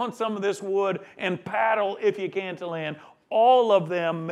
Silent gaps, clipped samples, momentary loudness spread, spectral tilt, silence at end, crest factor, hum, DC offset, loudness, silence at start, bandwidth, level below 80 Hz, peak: none; under 0.1%; 12 LU; -5.5 dB/octave; 0 s; 16 dB; none; under 0.1%; -25 LUFS; 0 s; 12.5 kHz; -78 dBFS; -8 dBFS